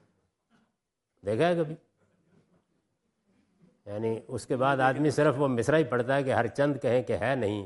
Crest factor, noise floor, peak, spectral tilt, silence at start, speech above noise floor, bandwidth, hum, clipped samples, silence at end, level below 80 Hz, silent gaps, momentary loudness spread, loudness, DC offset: 20 dB; -82 dBFS; -10 dBFS; -6.5 dB/octave; 1.25 s; 55 dB; 11.5 kHz; none; under 0.1%; 0 s; -68 dBFS; none; 10 LU; -27 LUFS; under 0.1%